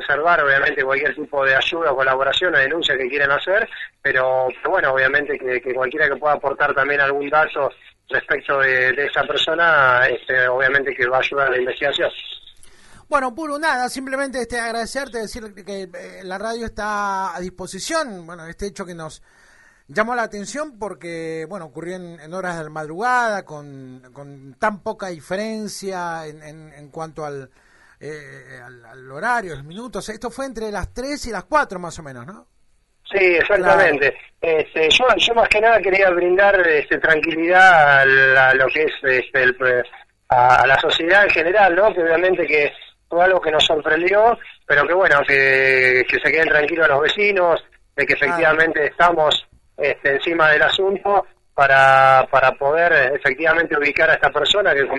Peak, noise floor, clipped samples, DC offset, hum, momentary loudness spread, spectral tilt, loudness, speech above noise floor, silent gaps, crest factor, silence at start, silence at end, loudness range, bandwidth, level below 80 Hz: 0 dBFS; -58 dBFS; under 0.1%; under 0.1%; none; 18 LU; -3.5 dB/octave; -16 LUFS; 40 dB; none; 18 dB; 0 s; 0 s; 14 LU; 11.5 kHz; -48 dBFS